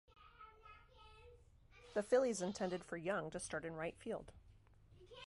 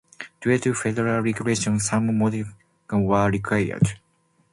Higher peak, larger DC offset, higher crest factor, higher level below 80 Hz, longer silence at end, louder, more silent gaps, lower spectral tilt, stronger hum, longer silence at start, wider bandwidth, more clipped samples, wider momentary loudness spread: second, -24 dBFS vs -4 dBFS; neither; about the same, 22 dB vs 18 dB; second, -68 dBFS vs -50 dBFS; second, 0.05 s vs 0.55 s; second, -42 LUFS vs -23 LUFS; neither; about the same, -4.5 dB/octave vs -5.5 dB/octave; neither; about the same, 0.2 s vs 0.2 s; about the same, 11.5 kHz vs 11.5 kHz; neither; first, 26 LU vs 8 LU